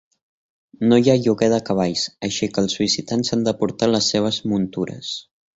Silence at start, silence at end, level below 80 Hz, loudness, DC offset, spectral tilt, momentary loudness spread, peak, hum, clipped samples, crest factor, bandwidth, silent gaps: 0.8 s; 0.35 s; -54 dBFS; -20 LUFS; under 0.1%; -5 dB/octave; 9 LU; -2 dBFS; none; under 0.1%; 18 dB; 8 kHz; none